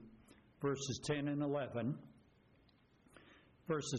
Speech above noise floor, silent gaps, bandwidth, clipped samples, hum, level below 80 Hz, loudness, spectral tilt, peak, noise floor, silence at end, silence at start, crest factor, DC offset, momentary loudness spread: 31 dB; none; 10 kHz; under 0.1%; none; -72 dBFS; -41 LUFS; -5.5 dB/octave; -26 dBFS; -70 dBFS; 0 s; 0 s; 16 dB; under 0.1%; 18 LU